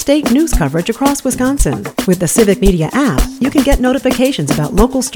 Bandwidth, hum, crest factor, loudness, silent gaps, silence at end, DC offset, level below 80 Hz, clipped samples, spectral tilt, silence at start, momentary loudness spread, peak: 19.5 kHz; none; 12 dB; -13 LUFS; none; 0 s; under 0.1%; -22 dBFS; under 0.1%; -5 dB/octave; 0 s; 5 LU; 0 dBFS